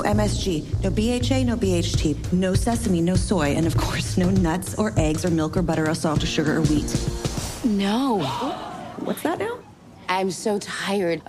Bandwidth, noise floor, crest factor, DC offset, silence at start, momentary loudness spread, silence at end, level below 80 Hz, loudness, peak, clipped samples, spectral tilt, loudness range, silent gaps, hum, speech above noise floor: 15.5 kHz; -45 dBFS; 14 dB; under 0.1%; 0 s; 7 LU; 0.05 s; -34 dBFS; -23 LUFS; -8 dBFS; under 0.1%; -5.5 dB/octave; 4 LU; none; none; 23 dB